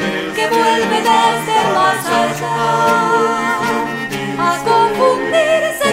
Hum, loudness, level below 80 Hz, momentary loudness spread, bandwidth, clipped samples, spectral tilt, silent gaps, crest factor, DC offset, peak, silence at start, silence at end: none; -14 LUFS; -52 dBFS; 5 LU; 16 kHz; under 0.1%; -3.5 dB/octave; none; 14 dB; under 0.1%; 0 dBFS; 0 s; 0 s